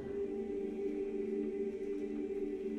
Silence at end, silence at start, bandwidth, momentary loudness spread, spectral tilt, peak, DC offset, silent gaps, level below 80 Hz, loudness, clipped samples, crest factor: 0 s; 0 s; 8.2 kHz; 2 LU; -8 dB/octave; -28 dBFS; under 0.1%; none; -62 dBFS; -39 LUFS; under 0.1%; 10 dB